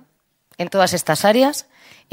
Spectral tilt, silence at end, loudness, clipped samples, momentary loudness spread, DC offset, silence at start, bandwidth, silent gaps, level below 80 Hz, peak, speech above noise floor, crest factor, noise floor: -4 dB/octave; 0.5 s; -17 LUFS; under 0.1%; 13 LU; under 0.1%; 0.6 s; 16.5 kHz; none; -62 dBFS; 0 dBFS; 43 dB; 18 dB; -61 dBFS